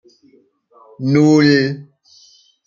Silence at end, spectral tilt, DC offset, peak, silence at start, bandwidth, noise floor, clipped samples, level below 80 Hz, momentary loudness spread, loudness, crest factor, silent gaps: 0.85 s; -6.5 dB/octave; under 0.1%; -2 dBFS; 1 s; 7.4 kHz; -53 dBFS; under 0.1%; -60 dBFS; 14 LU; -14 LUFS; 16 dB; none